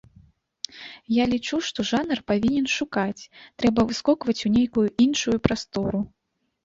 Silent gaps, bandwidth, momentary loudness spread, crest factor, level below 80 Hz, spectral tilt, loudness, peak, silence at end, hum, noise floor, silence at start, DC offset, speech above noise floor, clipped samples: none; 7.8 kHz; 15 LU; 22 dB; -50 dBFS; -5 dB/octave; -23 LUFS; -2 dBFS; 0.55 s; none; -56 dBFS; 0.75 s; under 0.1%; 33 dB; under 0.1%